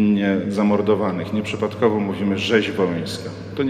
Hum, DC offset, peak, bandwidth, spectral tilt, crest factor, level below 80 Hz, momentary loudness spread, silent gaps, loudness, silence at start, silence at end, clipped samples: none; under 0.1%; -4 dBFS; 10 kHz; -6.5 dB/octave; 16 dB; -56 dBFS; 8 LU; none; -21 LUFS; 0 s; 0 s; under 0.1%